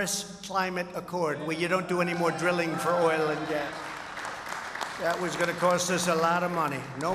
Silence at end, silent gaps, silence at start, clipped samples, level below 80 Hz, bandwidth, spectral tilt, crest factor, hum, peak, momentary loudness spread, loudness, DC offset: 0 s; none; 0 s; under 0.1%; -64 dBFS; 15.5 kHz; -4 dB/octave; 18 dB; none; -10 dBFS; 10 LU; -28 LUFS; under 0.1%